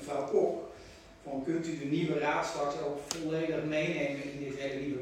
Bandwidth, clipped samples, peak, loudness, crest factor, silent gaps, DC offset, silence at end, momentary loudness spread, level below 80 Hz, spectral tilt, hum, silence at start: 16.5 kHz; under 0.1%; -12 dBFS; -33 LUFS; 22 dB; none; under 0.1%; 0 s; 11 LU; -64 dBFS; -5.5 dB/octave; none; 0 s